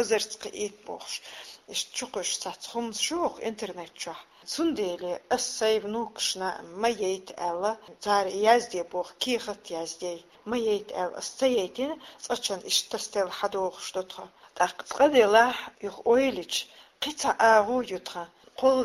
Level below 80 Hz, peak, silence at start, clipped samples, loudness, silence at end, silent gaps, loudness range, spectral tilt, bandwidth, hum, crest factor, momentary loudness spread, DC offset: -66 dBFS; -6 dBFS; 0 s; under 0.1%; -28 LUFS; 0 s; none; 6 LU; -2 dB/octave; 16 kHz; none; 22 dB; 15 LU; under 0.1%